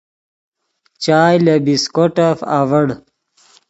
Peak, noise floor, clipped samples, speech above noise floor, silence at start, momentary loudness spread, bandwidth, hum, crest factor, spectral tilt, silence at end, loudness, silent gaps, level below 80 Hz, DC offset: 0 dBFS; -59 dBFS; under 0.1%; 46 dB; 1 s; 8 LU; 8.2 kHz; none; 16 dB; -6 dB/octave; 0.75 s; -14 LUFS; none; -58 dBFS; under 0.1%